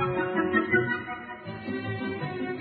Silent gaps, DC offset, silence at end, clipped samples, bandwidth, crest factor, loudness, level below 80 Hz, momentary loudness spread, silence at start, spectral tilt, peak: none; under 0.1%; 0 s; under 0.1%; 4.8 kHz; 18 dB; -29 LUFS; -60 dBFS; 13 LU; 0 s; -10 dB/octave; -10 dBFS